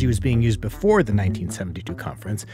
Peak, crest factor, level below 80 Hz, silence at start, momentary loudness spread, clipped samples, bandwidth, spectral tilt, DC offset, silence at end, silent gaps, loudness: -6 dBFS; 16 dB; -36 dBFS; 0 s; 12 LU; under 0.1%; 15.5 kHz; -7 dB/octave; under 0.1%; 0 s; none; -22 LUFS